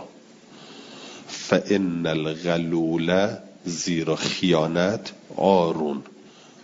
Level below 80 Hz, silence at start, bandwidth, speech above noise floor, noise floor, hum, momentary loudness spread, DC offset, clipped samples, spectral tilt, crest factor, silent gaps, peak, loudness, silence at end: -62 dBFS; 0 s; 7.8 kHz; 25 dB; -48 dBFS; none; 17 LU; under 0.1%; under 0.1%; -5 dB/octave; 22 dB; none; -2 dBFS; -23 LUFS; 0.35 s